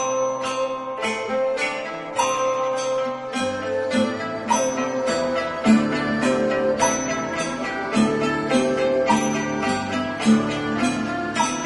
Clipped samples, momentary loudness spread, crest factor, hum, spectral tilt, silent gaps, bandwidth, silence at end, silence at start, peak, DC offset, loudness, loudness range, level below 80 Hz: under 0.1%; 6 LU; 16 dB; none; -4 dB/octave; none; 11.5 kHz; 0 s; 0 s; -6 dBFS; under 0.1%; -22 LUFS; 3 LU; -54 dBFS